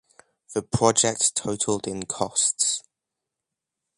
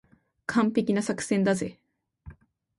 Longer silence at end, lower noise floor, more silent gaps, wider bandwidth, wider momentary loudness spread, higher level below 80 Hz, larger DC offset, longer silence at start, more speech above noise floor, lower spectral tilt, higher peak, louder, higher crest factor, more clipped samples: first, 1.15 s vs 0.45 s; first, -85 dBFS vs -51 dBFS; neither; about the same, 11.5 kHz vs 11.5 kHz; about the same, 11 LU vs 9 LU; about the same, -56 dBFS vs -60 dBFS; neither; about the same, 0.5 s vs 0.5 s; first, 61 dB vs 25 dB; second, -3 dB/octave vs -5.5 dB/octave; first, -4 dBFS vs -12 dBFS; first, -23 LUFS vs -26 LUFS; first, 24 dB vs 18 dB; neither